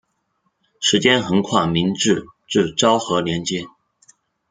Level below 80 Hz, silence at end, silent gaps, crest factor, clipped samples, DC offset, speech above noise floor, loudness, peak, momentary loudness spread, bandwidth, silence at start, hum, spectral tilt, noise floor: -54 dBFS; 0.85 s; none; 18 dB; under 0.1%; under 0.1%; 51 dB; -18 LUFS; -2 dBFS; 8 LU; 9.6 kHz; 0.8 s; none; -4 dB/octave; -69 dBFS